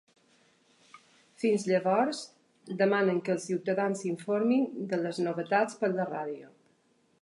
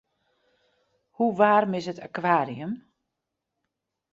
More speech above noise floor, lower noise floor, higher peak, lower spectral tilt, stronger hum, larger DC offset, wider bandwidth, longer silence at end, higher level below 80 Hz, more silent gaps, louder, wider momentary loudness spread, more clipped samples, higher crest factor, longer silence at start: second, 40 dB vs 60 dB; second, -69 dBFS vs -84 dBFS; second, -12 dBFS vs -6 dBFS; about the same, -6 dB/octave vs -7 dB/octave; neither; neither; first, 11.5 kHz vs 7.8 kHz; second, 0.75 s vs 1.35 s; second, -84 dBFS vs -72 dBFS; neither; second, -30 LUFS vs -25 LUFS; second, 10 LU vs 15 LU; neither; about the same, 18 dB vs 22 dB; second, 0.95 s vs 1.2 s